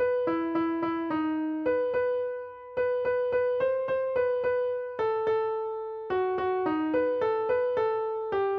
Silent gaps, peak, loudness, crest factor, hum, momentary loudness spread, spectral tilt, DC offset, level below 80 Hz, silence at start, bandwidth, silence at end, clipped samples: none; -16 dBFS; -28 LUFS; 12 dB; none; 5 LU; -8 dB/octave; under 0.1%; -64 dBFS; 0 s; 5 kHz; 0 s; under 0.1%